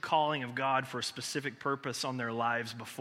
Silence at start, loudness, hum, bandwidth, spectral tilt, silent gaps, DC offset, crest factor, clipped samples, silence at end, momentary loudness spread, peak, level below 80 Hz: 0.05 s; -34 LUFS; none; 16 kHz; -3.5 dB/octave; none; under 0.1%; 20 dB; under 0.1%; 0 s; 6 LU; -14 dBFS; -80 dBFS